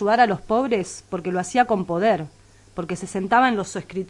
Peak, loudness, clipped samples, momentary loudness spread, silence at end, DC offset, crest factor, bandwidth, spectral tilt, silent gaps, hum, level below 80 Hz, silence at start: -6 dBFS; -22 LUFS; under 0.1%; 12 LU; 0 s; under 0.1%; 16 dB; 11.5 kHz; -5 dB/octave; none; none; -54 dBFS; 0 s